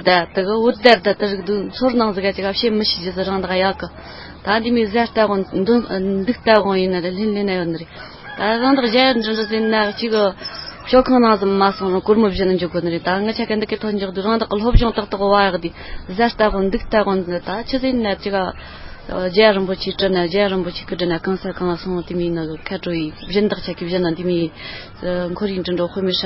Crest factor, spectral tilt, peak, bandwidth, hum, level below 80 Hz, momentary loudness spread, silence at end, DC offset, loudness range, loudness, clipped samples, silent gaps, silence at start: 18 dB; -8 dB/octave; 0 dBFS; 7.6 kHz; none; -34 dBFS; 11 LU; 0 s; under 0.1%; 5 LU; -18 LUFS; under 0.1%; none; 0 s